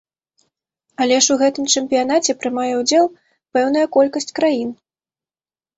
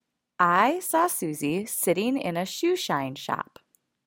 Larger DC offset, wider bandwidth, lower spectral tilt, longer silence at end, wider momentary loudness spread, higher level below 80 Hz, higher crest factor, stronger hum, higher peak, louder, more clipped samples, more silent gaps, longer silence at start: neither; second, 8.2 kHz vs 17 kHz; second, -1.5 dB/octave vs -4 dB/octave; first, 1.05 s vs 0.65 s; second, 7 LU vs 10 LU; first, -64 dBFS vs -70 dBFS; about the same, 18 dB vs 20 dB; neither; first, -2 dBFS vs -6 dBFS; first, -17 LUFS vs -25 LUFS; neither; neither; first, 1 s vs 0.4 s